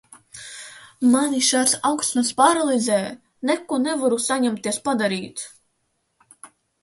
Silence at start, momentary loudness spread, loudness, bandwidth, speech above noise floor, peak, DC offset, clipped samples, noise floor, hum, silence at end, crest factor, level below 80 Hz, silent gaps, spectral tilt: 0.35 s; 19 LU; -20 LUFS; 12 kHz; 51 dB; -4 dBFS; under 0.1%; under 0.1%; -72 dBFS; none; 0.35 s; 18 dB; -68 dBFS; none; -2.5 dB/octave